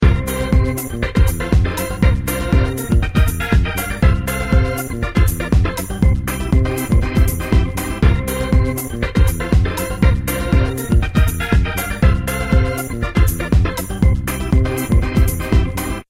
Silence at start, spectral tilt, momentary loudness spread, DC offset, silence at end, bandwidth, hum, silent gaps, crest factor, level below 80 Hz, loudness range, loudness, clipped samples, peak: 0 s; -6 dB/octave; 4 LU; under 0.1%; 0.05 s; 16 kHz; none; none; 14 dB; -18 dBFS; 0 LU; -17 LUFS; under 0.1%; 0 dBFS